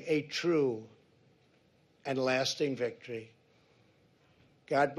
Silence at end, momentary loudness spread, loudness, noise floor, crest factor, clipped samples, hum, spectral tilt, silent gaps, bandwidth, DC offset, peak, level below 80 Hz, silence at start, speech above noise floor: 0 s; 14 LU; -33 LUFS; -67 dBFS; 20 dB; under 0.1%; none; -4.5 dB/octave; none; 13 kHz; under 0.1%; -14 dBFS; -78 dBFS; 0 s; 36 dB